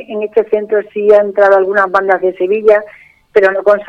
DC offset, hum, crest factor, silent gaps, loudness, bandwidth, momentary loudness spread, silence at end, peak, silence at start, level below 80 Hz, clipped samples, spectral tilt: under 0.1%; none; 12 dB; none; -11 LUFS; 6.2 kHz; 6 LU; 0.05 s; 0 dBFS; 0 s; -54 dBFS; 0.2%; -6.5 dB/octave